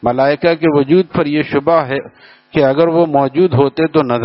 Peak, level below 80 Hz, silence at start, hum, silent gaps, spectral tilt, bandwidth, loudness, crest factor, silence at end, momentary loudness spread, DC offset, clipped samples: 0 dBFS; -48 dBFS; 0.05 s; none; none; -6 dB/octave; 5.8 kHz; -13 LUFS; 12 dB; 0 s; 4 LU; under 0.1%; under 0.1%